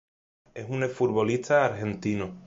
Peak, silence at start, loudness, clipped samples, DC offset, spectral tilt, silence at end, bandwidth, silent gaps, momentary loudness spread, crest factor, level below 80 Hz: -10 dBFS; 0.55 s; -26 LUFS; under 0.1%; under 0.1%; -6.5 dB/octave; 0 s; 7.8 kHz; none; 12 LU; 18 dB; -58 dBFS